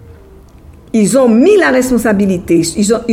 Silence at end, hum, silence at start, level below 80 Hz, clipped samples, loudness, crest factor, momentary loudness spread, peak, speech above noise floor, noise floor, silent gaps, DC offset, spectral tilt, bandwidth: 0 s; none; 0.1 s; -38 dBFS; under 0.1%; -10 LUFS; 12 dB; 6 LU; 0 dBFS; 28 dB; -38 dBFS; none; under 0.1%; -5 dB/octave; 16 kHz